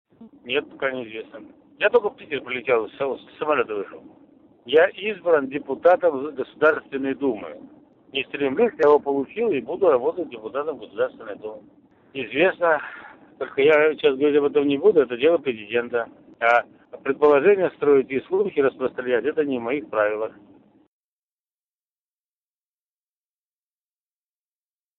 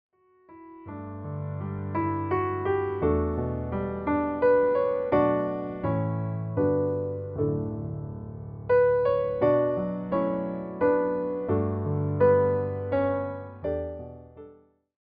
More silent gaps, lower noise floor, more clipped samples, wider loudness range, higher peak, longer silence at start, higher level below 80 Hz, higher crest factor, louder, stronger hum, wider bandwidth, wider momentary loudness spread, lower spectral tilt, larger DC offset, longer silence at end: neither; first, under -90 dBFS vs -55 dBFS; neither; about the same, 6 LU vs 4 LU; first, -6 dBFS vs -10 dBFS; second, 0.2 s vs 0.5 s; second, -66 dBFS vs -52 dBFS; about the same, 18 dB vs 18 dB; first, -22 LUFS vs -27 LUFS; neither; second, 4.2 kHz vs 4.8 kHz; about the same, 15 LU vs 14 LU; second, -2.5 dB/octave vs -12 dB/octave; neither; first, 4.7 s vs 0.5 s